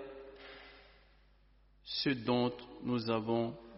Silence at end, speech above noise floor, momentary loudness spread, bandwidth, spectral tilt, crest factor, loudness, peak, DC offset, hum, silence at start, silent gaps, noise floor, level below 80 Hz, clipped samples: 0 s; 31 dB; 20 LU; 5.8 kHz; -4.5 dB/octave; 18 dB; -35 LUFS; -20 dBFS; under 0.1%; none; 0 s; none; -66 dBFS; -66 dBFS; under 0.1%